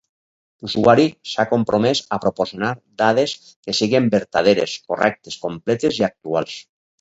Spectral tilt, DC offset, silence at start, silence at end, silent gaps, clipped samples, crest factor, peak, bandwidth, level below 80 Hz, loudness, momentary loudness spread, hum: -5 dB/octave; under 0.1%; 0.65 s; 0.4 s; 3.56-3.63 s; under 0.1%; 18 dB; 0 dBFS; 8 kHz; -56 dBFS; -19 LUFS; 10 LU; none